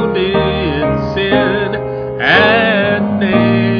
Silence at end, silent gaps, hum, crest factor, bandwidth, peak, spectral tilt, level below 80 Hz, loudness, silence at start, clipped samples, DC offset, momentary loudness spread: 0 s; none; none; 12 dB; 5.4 kHz; 0 dBFS; -8 dB/octave; -34 dBFS; -13 LUFS; 0 s; under 0.1%; under 0.1%; 7 LU